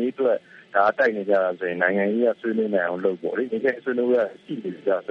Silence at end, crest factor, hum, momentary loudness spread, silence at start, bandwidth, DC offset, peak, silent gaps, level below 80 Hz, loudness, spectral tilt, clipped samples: 0.1 s; 18 dB; none; 7 LU; 0 s; 6.4 kHz; under 0.1%; -6 dBFS; none; -74 dBFS; -23 LUFS; -8 dB/octave; under 0.1%